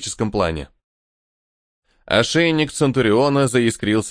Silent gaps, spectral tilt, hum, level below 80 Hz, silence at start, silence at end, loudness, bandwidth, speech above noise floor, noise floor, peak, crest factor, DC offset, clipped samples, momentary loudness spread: 0.84-1.82 s; -5 dB/octave; none; -44 dBFS; 0 s; 0 s; -18 LUFS; 10.5 kHz; over 72 dB; under -90 dBFS; -2 dBFS; 18 dB; under 0.1%; under 0.1%; 6 LU